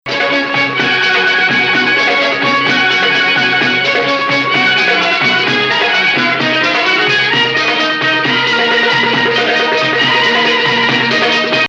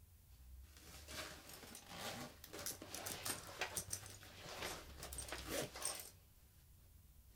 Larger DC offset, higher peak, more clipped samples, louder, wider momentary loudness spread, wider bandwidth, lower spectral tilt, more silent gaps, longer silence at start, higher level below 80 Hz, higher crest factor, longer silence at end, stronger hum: neither; first, 0 dBFS vs -26 dBFS; neither; first, -10 LUFS vs -48 LUFS; second, 2 LU vs 22 LU; second, 9.6 kHz vs 18 kHz; first, -3.5 dB/octave vs -2 dB/octave; neither; about the same, 0.05 s vs 0 s; about the same, -60 dBFS vs -64 dBFS; second, 12 dB vs 26 dB; about the same, 0 s vs 0 s; neither